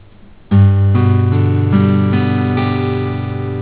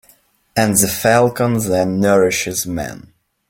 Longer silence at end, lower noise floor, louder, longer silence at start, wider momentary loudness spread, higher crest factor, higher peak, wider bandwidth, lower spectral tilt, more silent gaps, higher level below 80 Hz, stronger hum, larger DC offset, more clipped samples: second, 0 s vs 0.5 s; second, -41 dBFS vs -54 dBFS; about the same, -14 LUFS vs -16 LUFS; about the same, 0.5 s vs 0.55 s; about the same, 8 LU vs 10 LU; about the same, 12 dB vs 16 dB; about the same, 0 dBFS vs 0 dBFS; second, 4 kHz vs 17 kHz; first, -12.5 dB/octave vs -4.5 dB/octave; neither; first, -28 dBFS vs -48 dBFS; neither; first, 0.8% vs under 0.1%; neither